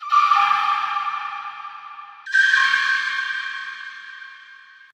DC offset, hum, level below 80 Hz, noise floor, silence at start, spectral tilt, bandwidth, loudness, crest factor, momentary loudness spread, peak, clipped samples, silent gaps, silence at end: under 0.1%; none; under -90 dBFS; -46 dBFS; 0 s; 2.5 dB/octave; 11 kHz; -19 LUFS; 18 dB; 22 LU; -4 dBFS; under 0.1%; none; 0.4 s